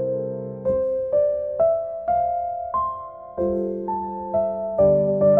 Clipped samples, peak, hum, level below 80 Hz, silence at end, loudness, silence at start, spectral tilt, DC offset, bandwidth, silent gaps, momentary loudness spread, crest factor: under 0.1%; -6 dBFS; none; -50 dBFS; 0 s; -23 LUFS; 0 s; -12.5 dB/octave; under 0.1%; 2.5 kHz; none; 9 LU; 16 dB